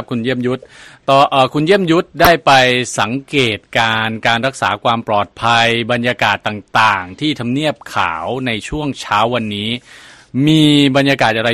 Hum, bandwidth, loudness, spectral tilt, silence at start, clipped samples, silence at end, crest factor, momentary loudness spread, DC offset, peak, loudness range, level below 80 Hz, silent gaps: none; 13.5 kHz; -14 LUFS; -5 dB/octave; 0 s; under 0.1%; 0 s; 14 dB; 10 LU; under 0.1%; 0 dBFS; 4 LU; -44 dBFS; none